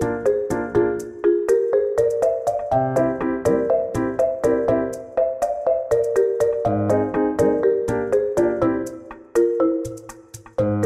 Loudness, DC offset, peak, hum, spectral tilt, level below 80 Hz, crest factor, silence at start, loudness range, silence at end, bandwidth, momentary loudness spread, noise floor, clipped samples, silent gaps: -21 LUFS; under 0.1%; -6 dBFS; none; -7.5 dB/octave; -48 dBFS; 14 dB; 0 s; 1 LU; 0 s; 14.5 kHz; 6 LU; -41 dBFS; under 0.1%; none